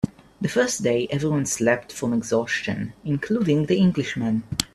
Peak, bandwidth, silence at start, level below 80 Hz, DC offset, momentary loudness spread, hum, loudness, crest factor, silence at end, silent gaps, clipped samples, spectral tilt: -2 dBFS; 14.5 kHz; 0.05 s; -52 dBFS; under 0.1%; 8 LU; none; -23 LUFS; 22 dB; 0.1 s; none; under 0.1%; -5 dB/octave